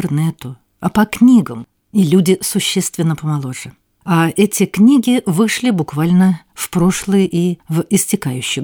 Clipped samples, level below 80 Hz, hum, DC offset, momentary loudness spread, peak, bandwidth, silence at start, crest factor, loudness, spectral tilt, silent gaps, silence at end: under 0.1%; -50 dBFS; none; under 0.1%; 12 LU; -2 dBFS; 19 kHz; 0 s; 14 dB; -15 LUFS; -5.5 dB/octave; none; 0 s